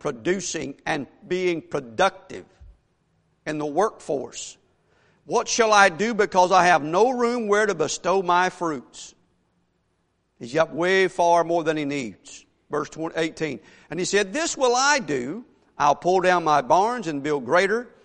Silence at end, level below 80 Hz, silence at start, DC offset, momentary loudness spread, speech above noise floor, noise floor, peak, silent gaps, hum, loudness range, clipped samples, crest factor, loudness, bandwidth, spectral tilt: 0.15 s; -60 dBFS; 0.05 s; under 0.1%; 16 LU; 48 dB; -70 dBFS; -2 dBFS; none; none; 8 LU; under 0.1%; 22 dB; -22 LUFS; 11 kHz; -3.5 dB/octave